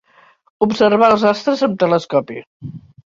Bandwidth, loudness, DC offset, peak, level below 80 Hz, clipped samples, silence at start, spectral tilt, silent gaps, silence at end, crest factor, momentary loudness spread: 7.8 kHz; -15 LUFS; under 0.1%; -2 dBFS; -56 dBFS; under 0.1%; 0.6 s; -6 dB/octave; 2.47-2.60 s; 0.3 s; 16 dB; 21 LU